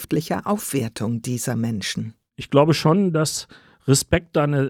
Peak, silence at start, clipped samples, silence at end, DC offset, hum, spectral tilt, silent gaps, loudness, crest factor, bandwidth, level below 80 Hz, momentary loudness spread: -2 dBFS; 0 s; under 0.1%; 0 s; under 0.1%; none; -5 dB/octave; none; -21 LUFS; 18 dB; 18.5 kHz; -46 dBFS; 13 LU